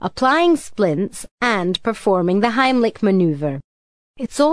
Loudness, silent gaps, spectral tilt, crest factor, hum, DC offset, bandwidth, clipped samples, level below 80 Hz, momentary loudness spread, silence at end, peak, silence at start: -18 LUFS; 1.31-1.38 s, 3.64-4.14 s; -5.5 dB/octave; 16 dB; none; 0.6%; 11 kHz; under 0.1%; -52 dBFS; 10 LU; 0 s; -2 dBFS; 0 s